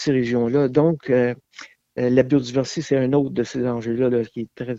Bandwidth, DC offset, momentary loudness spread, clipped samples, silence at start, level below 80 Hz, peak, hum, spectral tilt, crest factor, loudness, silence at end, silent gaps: 7.8 kHz; under 0.1%; 7 LU; under 0.1%; 0 s; -56 dBFS; -2 dBFS; none; -7 dB/octave; 18 dB; -21 LUFS; 0 s; none